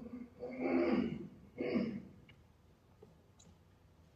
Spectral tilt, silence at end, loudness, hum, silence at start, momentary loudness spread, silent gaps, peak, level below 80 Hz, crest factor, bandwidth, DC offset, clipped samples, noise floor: -8 dB/octave; 0.65 s; -39 LUFS; none; 0 s; 19 LU; none; -22 dBFS; -70 dBFS; 18 dB; 7.8 kHz; under 0.1%; under 0.1%; -66 dBFS